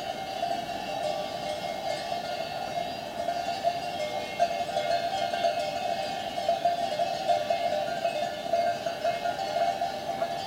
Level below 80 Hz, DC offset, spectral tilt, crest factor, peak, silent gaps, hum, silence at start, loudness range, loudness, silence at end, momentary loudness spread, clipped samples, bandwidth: -62 dBFS; under 0.1%; -3.5 dB/octave; 18 dB; -12 dBFS; none; none; 0 s; 3 LU; -30 LUFS; 0 s; 5 LU; under 0.1%; 16 kHz